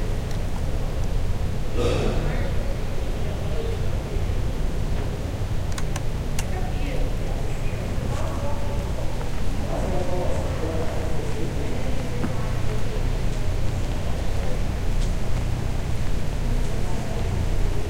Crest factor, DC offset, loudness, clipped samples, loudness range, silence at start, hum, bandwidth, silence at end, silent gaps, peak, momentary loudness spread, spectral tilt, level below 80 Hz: 12 dB; under 0.1%; -28 LUFS; under 0.1%; 1 LU; 0 s; none; 15.5 kHz; 0 s; none; -8 dBFS; 3 LU; -6 dB/octave; -26 dBFS